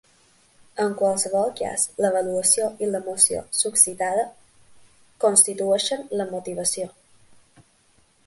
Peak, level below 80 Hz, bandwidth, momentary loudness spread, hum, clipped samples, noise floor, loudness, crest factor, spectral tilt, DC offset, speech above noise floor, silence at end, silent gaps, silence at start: 0 dBFS; -64 dBFS; 12 kHz; 11 LU; none; under 0.1%; -60 dBFS; -21 LUFS; 24 dB; -2 dB/octave; under 0.1%; 38 dB; 1.4 s; none; 0.75 s